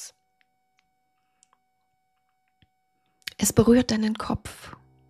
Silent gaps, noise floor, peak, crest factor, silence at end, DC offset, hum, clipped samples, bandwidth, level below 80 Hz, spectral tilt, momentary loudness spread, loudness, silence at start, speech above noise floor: none; -73 dBFS; -2 dBFS; 26 dB; 0.4 s; under 0.1%; none; under 0.1%; 14.5 kHz; -50 dBFS; -5 dB/octave; 24 LU; -23 LUFS; 0 s; 51 dB